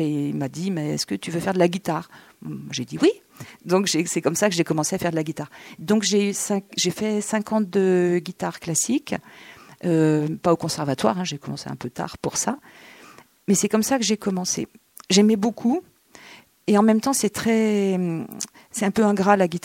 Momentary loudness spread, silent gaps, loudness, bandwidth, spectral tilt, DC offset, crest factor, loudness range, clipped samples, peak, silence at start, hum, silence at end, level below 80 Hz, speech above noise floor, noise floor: 13 LU; none; -22 LUFS; 17 kHz; -4.5 dB/octave; under 0.1%; 20 dB; 3 LU; under 0.1%; -2 dBFS; 0 s; none; 0.05 s; -62 dBFS; 27 dB; -49 dBFS